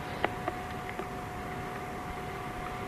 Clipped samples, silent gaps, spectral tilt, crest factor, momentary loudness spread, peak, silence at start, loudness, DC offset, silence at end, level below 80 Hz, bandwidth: under 0.1%; none; -5.5 dB/octave; 28 dB; 5 LU; -8 dBFS; 0 s; -37 LUFS; under 0.1%; 0 s; -50 dBFS; 13.5 kHz